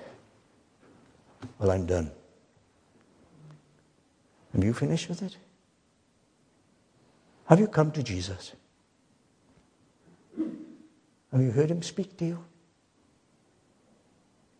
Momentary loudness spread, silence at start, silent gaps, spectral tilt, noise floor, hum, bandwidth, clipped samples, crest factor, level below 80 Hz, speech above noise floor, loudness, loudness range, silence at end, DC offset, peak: 24 LU; 0 s; none; -7 dB/octave; -68 dBFS; none; 10 kHz; under 0.1%; 32 dB; -58 dBFS; 41 dB; -28 LUFS; 5 LU; 2.15 s; under 0.1%; 0 dBFS